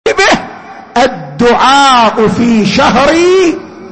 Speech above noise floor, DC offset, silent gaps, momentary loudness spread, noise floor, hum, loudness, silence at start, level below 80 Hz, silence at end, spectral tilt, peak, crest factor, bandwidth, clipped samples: 22 dB; under 0.1%; none; 8 LU; -28 dBFS; none; -8 LUFS; 0.05 s; -36 dBFS; 0 s; -4 dB/octave; 0 dBFS; 8 dB; 8.8 kHz; under 0.1%